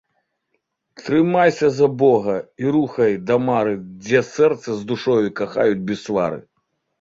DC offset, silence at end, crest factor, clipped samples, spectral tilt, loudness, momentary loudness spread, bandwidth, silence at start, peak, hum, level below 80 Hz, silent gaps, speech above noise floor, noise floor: under 0.1%; 0.6 s; 16 dB; under 0.1%; -6.5 dB/octave; -19 LUFS; 9 LU; 7.8 kHz; 1 s; -2 dBFS; none; -58 dBFS; none; 54 dB; -73 dBFS